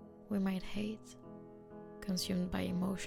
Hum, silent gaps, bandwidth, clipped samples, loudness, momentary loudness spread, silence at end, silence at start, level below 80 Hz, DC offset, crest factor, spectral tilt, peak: none; none; 16.5 kHz; under 0.1%; -38 LUFS; 17 LU; 0 s; 0 s; -56 dBFS; under 0.1%; 16 dB; -5.5 dB/octave; -22 dBFS